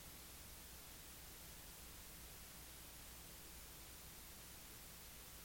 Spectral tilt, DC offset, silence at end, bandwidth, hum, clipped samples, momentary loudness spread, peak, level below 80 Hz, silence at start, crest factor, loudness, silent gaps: -2 dB/octave; under 0.1%; 0 s; 17 kHz; none; under 0.1%; 0 LU; -44 dBFS; -64 dBFS; 0 s; 14 dB; -55 LUFS; none